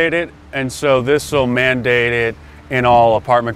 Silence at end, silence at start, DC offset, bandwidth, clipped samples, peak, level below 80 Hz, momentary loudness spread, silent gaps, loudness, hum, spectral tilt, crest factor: 0 s; 0 s; under 0.1%; 15 kHz; under 0.1%; 0 dBFS; -40 dBFS; 10 LU; none; -15 LUFS; none; -5 dB/octave; 14 dB